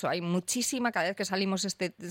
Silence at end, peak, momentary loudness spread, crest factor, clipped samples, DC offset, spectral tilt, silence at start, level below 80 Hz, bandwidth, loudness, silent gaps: 0 s; -14 dBFS; 3 LU; 16 dB; under 0.1%; under 0.1%; -3.5 dB/octave; 0 s; -74 dBFS; 16.5 kHz; -30 LUFS; none